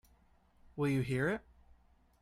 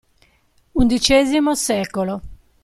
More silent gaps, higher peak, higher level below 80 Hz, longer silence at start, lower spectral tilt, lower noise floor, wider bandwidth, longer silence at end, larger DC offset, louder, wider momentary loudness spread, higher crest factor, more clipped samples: neither; second, -22 dBFS vs -2 dBFS; second, -62 dBFS vs -36 dBFS; about the same, 0.75 s vs 0.75 s; first, -7.5 dB/octave vs -3.5 dB/octave; first, -68 dBFS vs -58 dBFS; first, 15 kHz vs 13.5 kHz; first, 0.85 s vs 0.3 s; neither; second, -35 LUFS vs -18 LUFS; about the same, 10 LU vs 12 LU; about the same, 16 dB vs 18 dB; neither